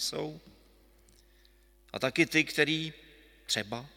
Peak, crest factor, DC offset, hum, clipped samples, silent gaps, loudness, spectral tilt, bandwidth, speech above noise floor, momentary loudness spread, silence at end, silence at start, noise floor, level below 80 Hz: -8 dBFS; 26 dB; under 0.1%; none; under 0.1%; none; -30 LUFS; -3.5 dB/octave; 17 kHz; 31 dB; 17 LU; 0.1 s; 0 s; -62 dBFS; -64 dBFS